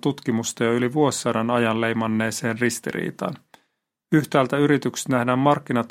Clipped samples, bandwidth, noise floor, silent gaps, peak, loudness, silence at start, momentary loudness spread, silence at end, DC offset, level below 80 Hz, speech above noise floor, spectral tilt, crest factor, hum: under 0.1%; 16.5 kHz; -74 dBFS; none; -2 dBFS; -22 LUFS; 0.05 s; 8 LU; 0.05 s; under 0.1%; -64 dBFS; 52 dB; -5 dB/octave; 20 dB; none